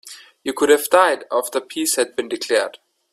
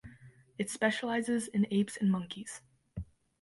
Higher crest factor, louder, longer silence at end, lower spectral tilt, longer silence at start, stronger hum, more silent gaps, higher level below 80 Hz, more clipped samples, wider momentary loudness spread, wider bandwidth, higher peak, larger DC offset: about the same, 20 dB vs 18 dB; first, -19 LUFS vs -33 LUFS; about the same, 0.35 s vs 0.4 s; second, -1 dB/octave vs -5 dB/octave; about the same, 0.05 s vs 0.05 s; neither; neither; second, -64 dBFS vs -58 dBFS; neither; second, 14 LU vs 18 LU; first, 16 kHz vs 11.5 kHz; first, 0 dBFS vs -16 dBFS; neither